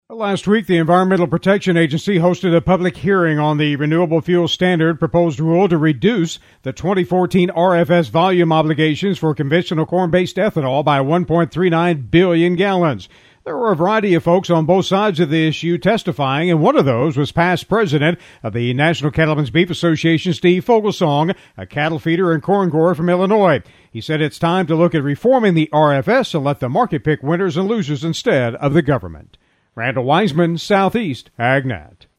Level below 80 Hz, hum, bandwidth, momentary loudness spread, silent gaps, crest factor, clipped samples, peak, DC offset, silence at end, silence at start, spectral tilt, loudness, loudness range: -48 dBFS; none; 12.5 kHz; 6 LU; none; 16 dB; under 0.1%; 0 dBFS; under 0.1%; 0.35 s; 0.1 s; -7 dB/octave; -16 LUFS; 2 LU